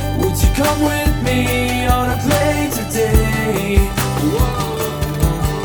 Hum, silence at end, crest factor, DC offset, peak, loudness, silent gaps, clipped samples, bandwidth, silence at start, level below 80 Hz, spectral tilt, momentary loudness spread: none; 0 s; 14 dB; under 0.1%; 0 dBFS; -17 LUFS; none; under 0.1%; over 20 kHz; 0 s; -22 dBFS; -5 dB/octave; 4 LU